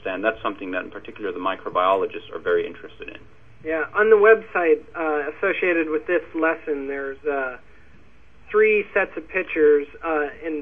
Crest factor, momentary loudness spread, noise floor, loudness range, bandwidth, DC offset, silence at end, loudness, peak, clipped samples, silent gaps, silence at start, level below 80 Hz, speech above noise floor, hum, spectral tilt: 20 dB; 13 LU; -53 dBFS; 5 LU; 3.7 kHz; 0.5%; 0 s; -22 LUFS; -2 dBFS; under 0.1%; none; 0.05 s; -56 dBFS; 31 dB; none; -7 dB/octave